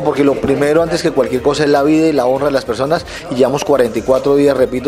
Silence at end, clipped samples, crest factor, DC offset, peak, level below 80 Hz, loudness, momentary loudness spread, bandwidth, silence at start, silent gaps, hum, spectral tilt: 0 s; under 0.1%; 14 dB; under 0.1%; 0 dBFS; -40 dBFS; -14 LUFS; 5 LU; 15 kHz; 0 s; none; none; -5.5 dB/octave